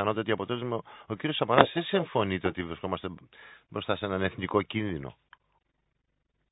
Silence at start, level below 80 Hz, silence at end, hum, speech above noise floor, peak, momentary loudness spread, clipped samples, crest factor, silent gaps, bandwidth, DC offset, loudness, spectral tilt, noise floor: 0 s; -56 dBFS; 1.4 s; none; 48 dB; 0 dBFS; 16 LU; under 0.1%; 30 dB; none; 4 kHz; under 0.1%; -29 LUFS; -10 dB/octave; -77 dBFS